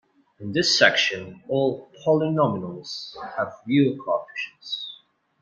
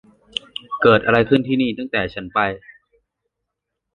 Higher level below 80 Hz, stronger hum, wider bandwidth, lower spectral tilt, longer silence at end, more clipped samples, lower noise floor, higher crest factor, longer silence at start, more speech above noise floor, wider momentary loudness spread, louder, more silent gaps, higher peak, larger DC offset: second, -68 dBFS vs -50 dBFS; neither; about the same, 9 kHz vs 9.4 kHz; second, -4 dB/octave vs -7 dB/octave; second, 0.45 s vs 1.25 s; neither; second, -53 dBFS vs -80 dBFS; about the same, 22 dB vs 20 dB; second, 0.4 s vs 0.7 s; second, 29 dB vs 62 dB; about the same, 16 LU vs 15 LU; second, -23 LUFS vs -19 LUFS; neither; about the same, -2 dBFS vs -2 dBFS; neither